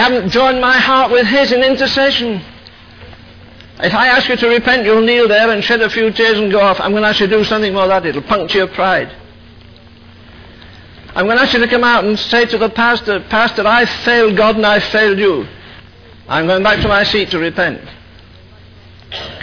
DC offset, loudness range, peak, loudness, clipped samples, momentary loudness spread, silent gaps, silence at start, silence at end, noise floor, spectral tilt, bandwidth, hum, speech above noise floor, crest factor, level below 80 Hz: under 0.1%; 5 LU; -2 dBFS; -12 LUFS; under 0.1%; 7 LU; none; 0 s; 0 s; -39 dBFS; -5 dB/octave; 5.4 kHz; none; 27 dB; 12 dB; -40 dBFS